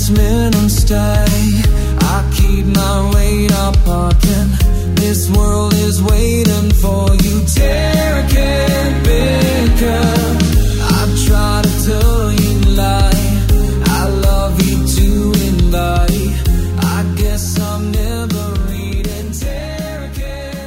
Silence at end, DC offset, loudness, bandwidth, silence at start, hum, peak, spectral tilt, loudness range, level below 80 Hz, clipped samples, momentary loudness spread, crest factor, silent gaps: 0 s; under 0.1%; -14 LUFS; 16.5 kHz; 0 s; none; 0 dBFS; -5.5 dB/octave; 3 LU; -14 dBFS; under 0.1%; 6 LU; 12 dB; none